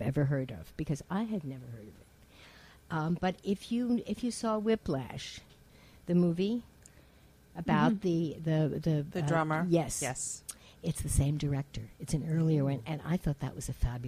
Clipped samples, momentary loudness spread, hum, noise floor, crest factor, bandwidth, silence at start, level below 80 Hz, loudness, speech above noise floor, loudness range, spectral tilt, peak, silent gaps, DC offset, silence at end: under 0.1%; 13 LU; none; -60 dBFS; 18 dB; 15.5 kHz; 0 s; -48 dBFS; -33 LUFS; 28 dB; 5 LU; -6 dB/octave; -14 dBFS; none; under 0.1%; 0 s